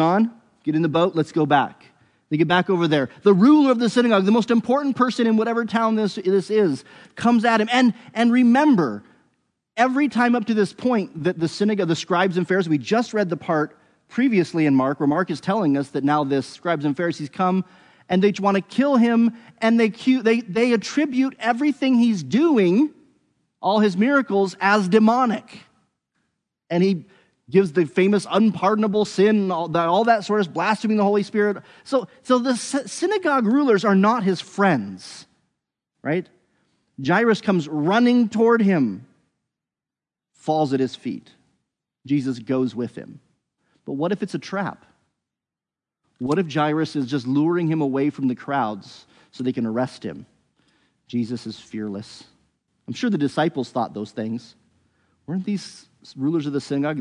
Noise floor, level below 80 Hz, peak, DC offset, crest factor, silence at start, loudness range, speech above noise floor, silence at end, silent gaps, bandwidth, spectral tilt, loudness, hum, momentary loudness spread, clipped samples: -90 dBFS; -72 dBFS; -4 dBFS; under 0.1%; 18 dB; 0 s; 9 LU; 70 dB; 0 s; none; 10.5 kHz; -6.5 dB/octave; -20 LUFS; none; 12 LU; under 0.1%